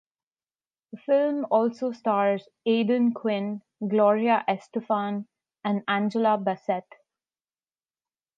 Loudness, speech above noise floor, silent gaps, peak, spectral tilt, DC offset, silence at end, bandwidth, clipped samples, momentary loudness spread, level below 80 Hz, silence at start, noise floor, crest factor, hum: -25 LUFS; over 65 dB; none; -10 dBFS; -7.5 dB/octave; under 0.1%; 1.55 s; 7.4 kHz; under 0.1%; 10 LU; -82 dBFS; 0.95 s; under -90 dBFS; 18 dB; none